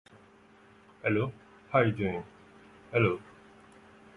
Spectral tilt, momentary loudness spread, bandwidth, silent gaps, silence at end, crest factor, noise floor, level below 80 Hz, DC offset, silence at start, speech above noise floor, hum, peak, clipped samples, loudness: -8.5 dB/octave; 12 LU; 10.5 kHz; none; 0.95 s; 22 dB; -58 dBFS; -60 dBFS; under 0.1%; 1.05 s; 30 dB; none; -10 dBFS; under 0.1%; -30 LUFS